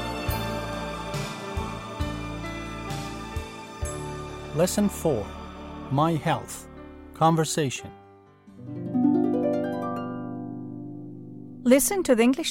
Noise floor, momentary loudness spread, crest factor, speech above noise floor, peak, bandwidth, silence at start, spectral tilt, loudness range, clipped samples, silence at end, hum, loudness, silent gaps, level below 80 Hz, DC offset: -52 dBFS; 18 LU; 22 dB; 29 dB; -6 dBFS; 16.5 kHz; 0 s; -5 dB/octave; 7 LU; under 0.1%; 0 s; none; -27 LUFS; none; -44 dBFS; under 0.1%